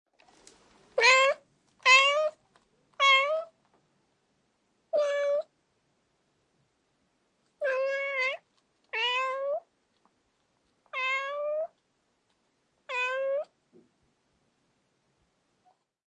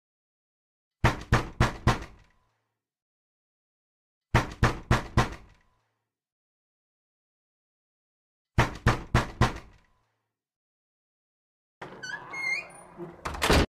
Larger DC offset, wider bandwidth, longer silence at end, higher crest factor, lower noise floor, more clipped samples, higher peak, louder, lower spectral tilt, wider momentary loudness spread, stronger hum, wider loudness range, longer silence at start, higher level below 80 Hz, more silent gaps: neither; second, 10.5 kHz vs 15.5 kHz; first, 2.7 s vs 0.05 s; about the same, 24 dB vs 22 dB; second, -75 dBFS vs -81 dBFS; neither; about the same, -8 dBFS vs -10 dBFS; about the same, -26 LUFS vs -28 LUFS; second, 2 dB/octave vs -5.5 dB/octave; about the same, 17 LU vs 19 LU; neither; first, 13 LU vs 6 LU; about the same, 0.95 s vs 1.05 s; second, -86 dBFS vs -38 dBFS; second, none vs 3.02-4.21 s, 6.32-8.45 s, 10.56-11.81 s